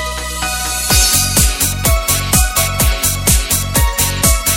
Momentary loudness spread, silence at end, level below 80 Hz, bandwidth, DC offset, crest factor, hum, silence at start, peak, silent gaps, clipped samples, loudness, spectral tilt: 6 LU; 0 s; -20 dBFS; 17.5 kHz; under 0.1%; 14 dB; none; 0 s; 0 dBFS; none; under 0.1%; -13 LUFS; -2.5 dB/octave